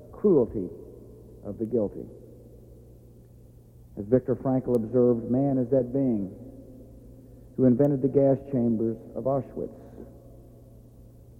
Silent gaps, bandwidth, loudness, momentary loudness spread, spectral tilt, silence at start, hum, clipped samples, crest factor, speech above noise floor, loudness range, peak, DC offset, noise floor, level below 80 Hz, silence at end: none; 2.6 kHz; -26 LUFS; 23 LU; -11.5 dB/octave; 0 s; none; under 0.1%; 18 dB; 26 dB; 7 LU; -8 dBFS; under 0.1%; -51 dBFS; -54 dBFS; 1 s